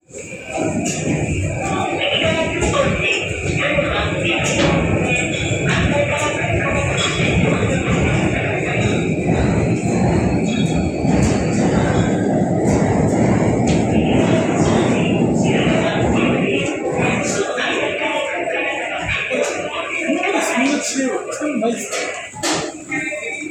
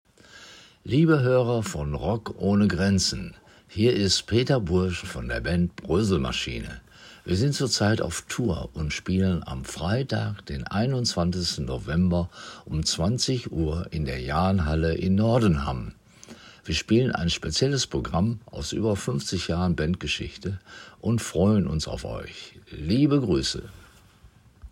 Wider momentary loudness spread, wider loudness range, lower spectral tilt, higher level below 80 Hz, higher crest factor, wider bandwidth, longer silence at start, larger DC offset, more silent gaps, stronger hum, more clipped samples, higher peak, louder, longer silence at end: second, 5 LU vs 13 LU; about the same, 3 LU vs 3 LU; about the same, -5 dB/octave vs -5.5 dB/octave; first, -34 dBFS vs -40 dBFS; about the same, 14 dB vs 16 dB; second, 14 kHz vs 16 kHz; second, 0.1 s vs 0.35 s; neither; neither; neither; neither; first, -2 dBFS vs -8 dBFS; first, -18 LUFS vs -25 LUFS; about the same, 0 s vs 0.05 s